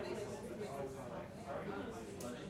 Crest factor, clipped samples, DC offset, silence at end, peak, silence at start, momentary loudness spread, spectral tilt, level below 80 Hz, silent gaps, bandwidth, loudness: 14 dB; under 0.1%; under 0.1%; 0 s; -32 dBFS; 0 s; 3 LU; -5.5 dB/octave; -66 dBFS; none; 16 kHz; -46 LUFS